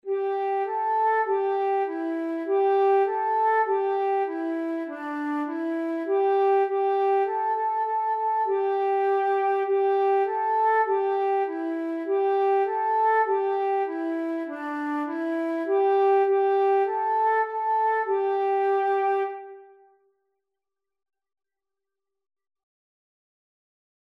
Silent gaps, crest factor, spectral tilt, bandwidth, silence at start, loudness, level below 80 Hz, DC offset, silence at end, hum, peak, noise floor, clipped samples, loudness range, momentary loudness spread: none; 12 dB; -4.5 dB/octave; 5.2 kHz; 0.05 s; -24 LUFS; under -90 dBFS; under 0.1%; 4.45 s; none; -12 dBFS; -89 dBFS; under 0.1%; 3 LU; 7 LU